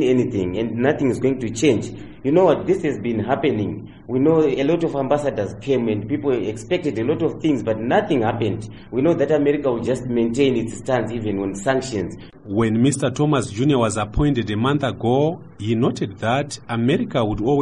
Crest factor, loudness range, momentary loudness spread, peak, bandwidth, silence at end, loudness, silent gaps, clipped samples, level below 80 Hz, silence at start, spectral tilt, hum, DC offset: 16 dB; 2 LU; 7 LU; -4 dBFS; 11 kHz; 0 s; -20 LUFS; none; under 0.1%; -44 dBFS; 0 s; -6.5 dB/octave; none; 0.4%